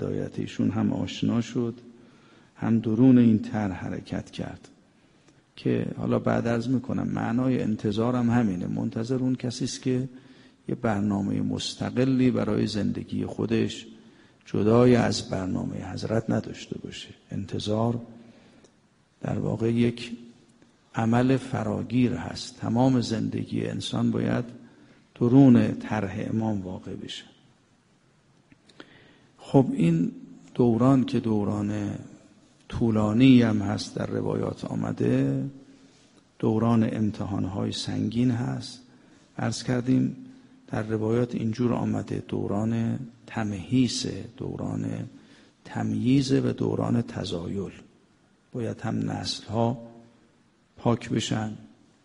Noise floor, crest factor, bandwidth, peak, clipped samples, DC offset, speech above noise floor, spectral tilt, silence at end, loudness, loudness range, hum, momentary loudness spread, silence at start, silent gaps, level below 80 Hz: -63 dBFS; 22 dB; 10.5 kHz; -4 dBFS; under 0.1%; under 0.1%; 38 dB; -7 dB/octave; 0.35 s; -26 LUFS; 6 LU; none; 15 LU; 0 s; none; -56 dBFS